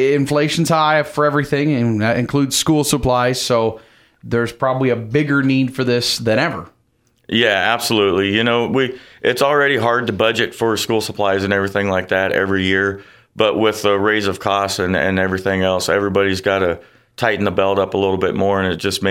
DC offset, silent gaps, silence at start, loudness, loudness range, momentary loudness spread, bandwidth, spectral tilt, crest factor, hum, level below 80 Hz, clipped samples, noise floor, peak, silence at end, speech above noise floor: under 0.1%; none; 0 s; -17 LUFS; 2 LU; 4 LU; 16.5 kHz; -4.5 dB/octave; 16 dB; none; -48 dBFS; under 0.1%; -61 dBFS; 0 dBFS; 0 s; 44 dB